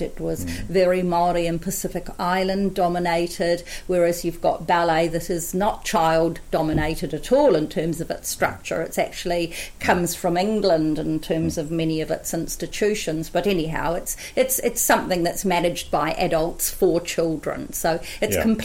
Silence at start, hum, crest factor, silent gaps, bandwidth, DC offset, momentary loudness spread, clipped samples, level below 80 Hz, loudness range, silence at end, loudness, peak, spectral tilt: 0 s; none; 18 dB; none; 16.5 kHz; under 0.1%; 8 LU; under 0.1%; -38 dBFS; 2 LU; 0 s; -22 LUFS; -4 dBFS; -4.5 dB/octave